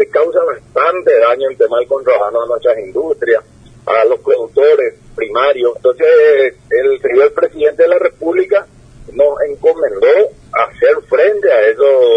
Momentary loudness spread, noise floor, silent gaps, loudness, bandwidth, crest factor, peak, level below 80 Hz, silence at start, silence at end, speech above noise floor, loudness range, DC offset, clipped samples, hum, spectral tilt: 6 LU; -36 dBFS; none; -12 LUFS; 8.6 kHz; 12 dB; 0 dBFS; -48 dBFS; 0 s; 0 s; 25 dB; 2 LU; under 0.1%; under 0.1%; none; -5.5 dB/octave